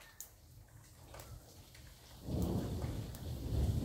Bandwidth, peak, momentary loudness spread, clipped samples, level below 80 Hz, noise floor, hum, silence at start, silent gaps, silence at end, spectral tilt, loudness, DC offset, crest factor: 16 kHz; -24 dBFS; 21 LU; under 0.1%; -48 dBFS; -59 dBFS; none; 0 s; none; 0 s; -6.5 dB/octave; -42 LUFS; under 0.1%; 16 dB